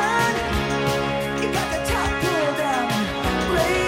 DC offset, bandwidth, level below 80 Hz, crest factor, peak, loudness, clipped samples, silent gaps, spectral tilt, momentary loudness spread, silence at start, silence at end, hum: under 0.1%; 16.5 kHz; -36 dBFS; 14 dB; -8 dBFS; -22 LUFS; under 0.1%; none; -4.5 dB/octave; 3 LU; 0 s; 0 s; none